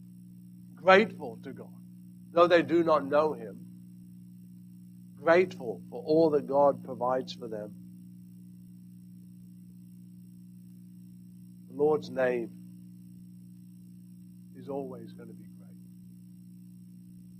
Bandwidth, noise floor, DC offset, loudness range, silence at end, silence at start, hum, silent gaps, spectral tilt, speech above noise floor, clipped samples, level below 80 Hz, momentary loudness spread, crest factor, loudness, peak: 14.5 kHz; -50 dBFS; under 0.1%; 19 LU; 0 s; 0.15 s; 60 Hz at -50 dBFS; none; -6.5 dB/octave; 23 dB; under 0.1%; -74 dBFS; 26 LU; 24 dB; -27 LUFS; -6 dBFS